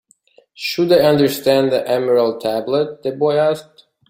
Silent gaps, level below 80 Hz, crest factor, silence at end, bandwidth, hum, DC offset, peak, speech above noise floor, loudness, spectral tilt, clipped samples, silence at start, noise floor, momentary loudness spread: none; -58 dBFS; 16 dB; 0.45 s; 16.5 kHz; none; under 0.1%; -2 dBFS; 38 dB; -17 LUFS; -5.5 dB/octave; under 0.1%; 0.6 s; -54 dBFS; 10 LU